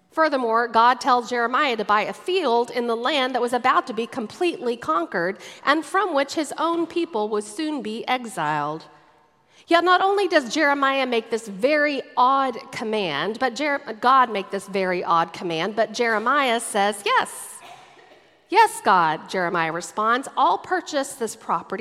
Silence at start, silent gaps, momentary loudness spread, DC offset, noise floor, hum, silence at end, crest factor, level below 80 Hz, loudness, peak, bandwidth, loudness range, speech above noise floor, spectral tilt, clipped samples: 0.15 s; none; 9 LU; under 0.1%; -58 dBFS; none; 0 s; 20 dB; -74 dBFS; -22 LUFS; -2 dBFS; 15.5 kHz; 3 LU; 36 dB; -3.5 dB/octave; under 0.1%